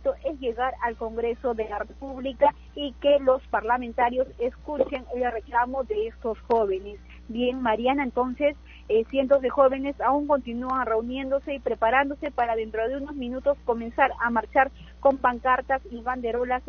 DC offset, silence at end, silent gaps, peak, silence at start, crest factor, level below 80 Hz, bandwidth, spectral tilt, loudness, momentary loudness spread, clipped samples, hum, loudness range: under 0.1%; 0 s; none; -6 dBFS; 0 s; 20 dB; -46 dBFS; 6.6 kHz; -3 dB/octave; -26 LUFS; 9 LU; under 0.1%; none; 3 LU